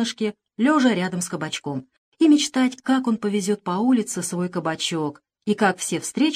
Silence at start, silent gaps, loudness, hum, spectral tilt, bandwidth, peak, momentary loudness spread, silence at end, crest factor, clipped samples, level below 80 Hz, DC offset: 0 s; 1.98-2.12 s; -22 LUFS; none; -4.5 dB/octave; 14.5 kHz; -6 dBFS; 10 LU; 0 s; 16 dB; under 0.1%; -72 dBFS; under 0.1%